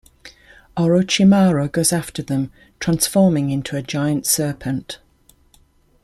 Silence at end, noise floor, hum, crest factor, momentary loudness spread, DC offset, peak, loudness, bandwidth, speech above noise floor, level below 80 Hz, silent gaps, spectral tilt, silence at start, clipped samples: 1.05 s; -55 dBFS; none; 18 dB; 13 LU; under 0.1%; -2 dBFS; -18 LUFS; 16 kHz; 37 dB; -50 dBFS; none; -5 dB/octave; 0.25 s; under 0.1%